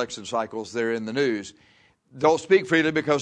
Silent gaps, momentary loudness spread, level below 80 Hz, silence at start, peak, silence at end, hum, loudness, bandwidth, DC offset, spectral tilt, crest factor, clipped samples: none; 11 LU; -64 dBFS; 0 s; -6 dBFS; 0 s; none; -24 LUFS; 10 kHz; under 0.1%; -5 dB/octave; 18 dB; under 0.1%